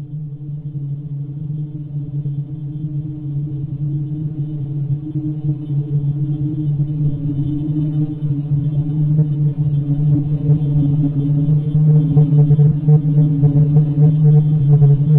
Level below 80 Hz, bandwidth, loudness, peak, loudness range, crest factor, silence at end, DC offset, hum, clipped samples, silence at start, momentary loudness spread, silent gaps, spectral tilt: -40 dBFS; 1.3 kHz; -17 LUFS; -4 dBFS; 11 LU; 12 dB; 0 s; under 0.1%; none; under 0.1%; 0 s; 13 LU; none; -13.5 dB/octave